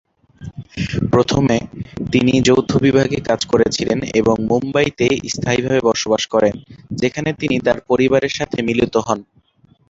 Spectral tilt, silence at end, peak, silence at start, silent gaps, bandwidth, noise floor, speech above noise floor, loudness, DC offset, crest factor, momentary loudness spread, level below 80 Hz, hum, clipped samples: -5.5 dB/octave; 0.65 s; -2 dBFS; 0.4 s; none; 8 kHz; -54 dBFS; 38 dB; -17 LUFS; under 0.1%; 16 dB; 10 LU; -42 dBFS; none; under 0.1%